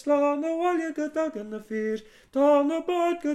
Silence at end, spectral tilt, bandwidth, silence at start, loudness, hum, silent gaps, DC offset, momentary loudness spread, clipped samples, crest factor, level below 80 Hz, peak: 0 s; -5.5 dB/octave; 12 kHz; 0.05 s; -26 LUFS; none; none; under 0.1%; 12 LU; under 0.1%; 16 dB; -68 dBFS; -10 dBFS